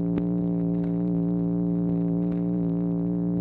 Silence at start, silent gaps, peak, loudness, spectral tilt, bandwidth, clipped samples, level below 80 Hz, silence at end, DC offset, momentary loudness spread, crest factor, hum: 0 s; none; -14 dBFS; -26 LUFS; -13.5 dB/octave; 2.6 kHz; under 0.1%; -50 dBFS; 0 s; under 0.1%; 1 LU; 12 dB; none